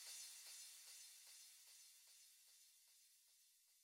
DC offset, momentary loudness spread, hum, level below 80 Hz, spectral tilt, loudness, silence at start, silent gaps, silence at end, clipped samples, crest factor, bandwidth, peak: under 0.1%; 14 LU; none; under -90 dBFS; 5.5 dB/octave; -60 LUFS; 0 s; none; 0 s; under 0.1%; 20 dB; 17.5 kHz; -44 dBFS